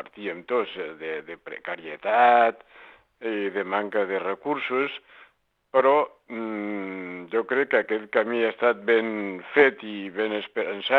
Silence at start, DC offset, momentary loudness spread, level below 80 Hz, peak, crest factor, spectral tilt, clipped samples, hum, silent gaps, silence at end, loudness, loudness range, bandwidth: 0 s; under 0.1%; 14 LU; -76 dBFS; -4 dBFS; 22 dB; -6.5 dB/octave; under 0.1%; none; none; 0 s; -25 LUFS; 3 LU; 4.5 kHz